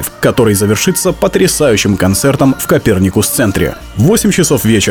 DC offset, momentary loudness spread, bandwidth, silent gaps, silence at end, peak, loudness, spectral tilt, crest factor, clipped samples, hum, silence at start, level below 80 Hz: under 0.1%; 3 LU; over 20 kHz; none; 0 s; 0 dBFS; -11 LUFS; -4.5 dB/octave; 10 dB; under 0.1%; none; 0 s; -32 dBFS